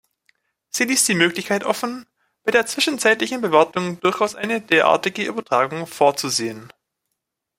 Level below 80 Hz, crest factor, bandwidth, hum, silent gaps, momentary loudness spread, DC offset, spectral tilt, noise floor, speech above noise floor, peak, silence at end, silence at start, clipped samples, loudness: -66 dBFS; 20 dB; 16 kHz; none; none; 9 LU; under 0.1%; -2.5 dB/octave; -79 dBFS; 59 dB; -2 dBFS; 0.9 s; 0.75 s; under 0.1%; -19 LUFS